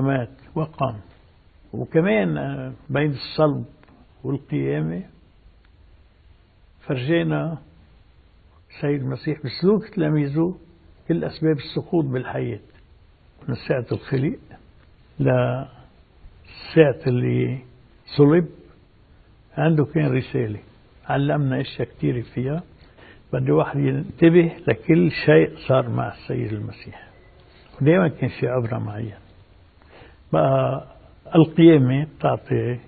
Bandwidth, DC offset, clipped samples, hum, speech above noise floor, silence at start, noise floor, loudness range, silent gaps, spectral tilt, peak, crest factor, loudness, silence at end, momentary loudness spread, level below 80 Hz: 4.7 kHz; under 0.1%; under 0.1%; none; 33 dB; 0 s; -53 dBFS; 8 LU; none; -12.5 dB/octave; 0 dBFS; 22 dB; -21 LUFS; 0.05 s; 16 LU; -52 dBFS